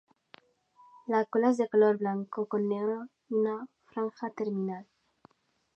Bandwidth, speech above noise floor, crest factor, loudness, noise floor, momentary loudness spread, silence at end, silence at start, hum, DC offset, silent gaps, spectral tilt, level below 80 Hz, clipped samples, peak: 8.4 kHz; 34 dB; 18 dB; -30 LUFS; -64 dBFS; 14 LU; 0.95 s; 1.1 s; none; under 0.1%; none; -8 dB/octave; -86 dBFS; under 0.1%; -12 dBFS